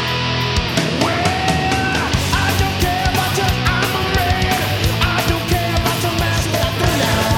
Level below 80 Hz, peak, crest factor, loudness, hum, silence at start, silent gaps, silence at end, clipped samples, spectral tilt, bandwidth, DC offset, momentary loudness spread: -28 dBFS; -2 dBFS; 14 dB; -17 LUFS; none; 0 s; none; 0 s; under 0.1%; -4.5 dB/octave; 19.5 kHz; under 0.1%; 2 LU